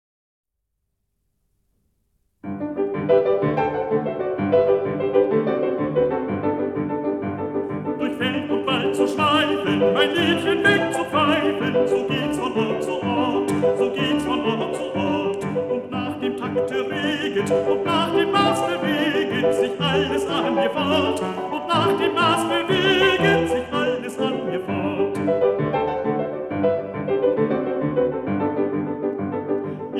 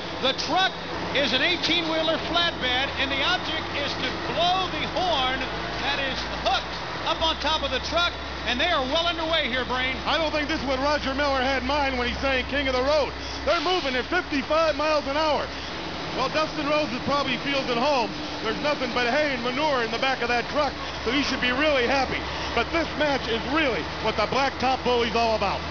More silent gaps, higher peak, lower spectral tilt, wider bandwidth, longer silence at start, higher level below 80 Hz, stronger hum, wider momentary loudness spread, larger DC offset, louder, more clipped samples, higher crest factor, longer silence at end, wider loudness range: neither; first, -4 dBFS vs -10 dBFS; first, -5.5 dB/octave vs -4 dB/octave; first, 13.5 kHz vs 5.4 kHz; first, 2.45 s vs 0 s; second, -54 dBFS vs -42 dBFS; neither; about the same, 7 LU vs 5 LU; second, under 0.1% vs 0.5%; first, -21 LUFS vs -24 LUFS; neither; about the same, 18 dB vs 16 dB; about the same, 0 s vs 0 s; about the same, 4 LU vs 2 LU